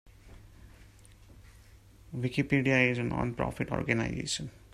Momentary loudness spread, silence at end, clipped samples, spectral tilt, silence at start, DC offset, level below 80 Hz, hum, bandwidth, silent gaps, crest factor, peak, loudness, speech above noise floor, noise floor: 10 LU; 0.15 s; under 0.1%; -5.5 dB/octave; 0.05 s; under 0.1%; -52 dBFS; none; 14 kHz; none; 22 dB; -12 dBFS; -30 LUFS; 26 dB; -55 dBFS